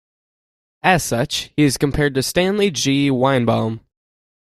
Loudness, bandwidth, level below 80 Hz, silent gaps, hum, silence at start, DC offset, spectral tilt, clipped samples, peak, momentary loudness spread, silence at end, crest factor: -18 LUFS; 15 kHz; -42 dBFS; none; none; 0.85 s; under 0.1%; -4.5 dB/octave; under 0.1%; -2 dBFS; 5 LU; 0.7 s; 18 dB